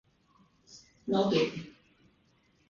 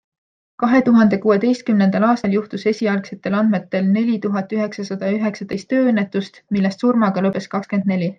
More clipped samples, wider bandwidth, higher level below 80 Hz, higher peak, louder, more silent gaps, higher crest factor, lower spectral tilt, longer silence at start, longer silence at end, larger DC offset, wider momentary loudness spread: neither; about the same, 7.4 kHz vs 7.6 kHz; second, -70 dBFS vs -62 dBFS; second, -14 dBFS vs -4 dBFS; second, -30 LUFS vs -18 LUFS; neither; first, 20 dB vs 14 dB; second, -6 dB/octave vs -7.5 dB/octave; about the same, 0.7 s vs 0.6 s; first, 1 s vs 0.05 s; neither; first, 26 LU vs 8 LU